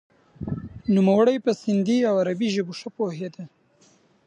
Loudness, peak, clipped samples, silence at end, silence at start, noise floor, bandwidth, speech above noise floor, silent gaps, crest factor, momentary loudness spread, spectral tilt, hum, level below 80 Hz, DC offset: -23 LUFS; -8 dBFS; under 0.1%; 0.8 s; 0.4 s; -59 dBFS; 9.4 kHz; 37 dB; none; 16 dB; 16 LU; -7 dB/octave; none; -54 dBFS; under 0.1%